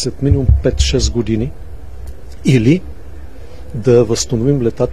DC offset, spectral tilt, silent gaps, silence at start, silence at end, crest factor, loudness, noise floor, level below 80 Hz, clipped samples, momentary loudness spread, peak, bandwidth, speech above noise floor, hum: 4%; -6 dB/octave; none; 0 s; 0 s; 16 dB; -15 LUFS; -33 dBFS; -22 dBFS; under 0.1%; 23 LU; 0 dBFS; 13 kHz; 20 dB; none